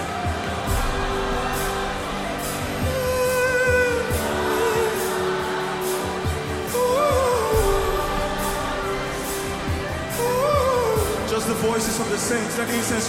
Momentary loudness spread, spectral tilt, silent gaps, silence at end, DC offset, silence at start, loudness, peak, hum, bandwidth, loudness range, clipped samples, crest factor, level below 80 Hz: 7 LU; -4 dB/octave; none; 0 s; under 0.1%; 0 s; -23 LUFS; -8 dBFS; none; 16.5 kHz; 2 LU; under 0.1%; 14 dB; -34 dBFS